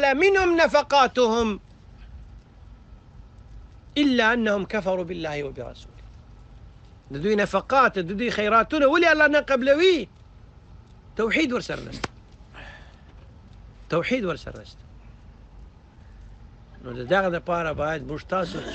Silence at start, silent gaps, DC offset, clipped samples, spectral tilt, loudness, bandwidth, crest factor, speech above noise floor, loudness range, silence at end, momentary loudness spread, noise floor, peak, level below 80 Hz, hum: 0 s; none; under 0.1%; under 0.1%; -5 dB/octave; -22 LUFS; 8.6 kHz; 18 dB; 26 dB; 12 LU; 0 s; 19 LU; -48 dBFS; -6 dBFS; -46 dBFS; none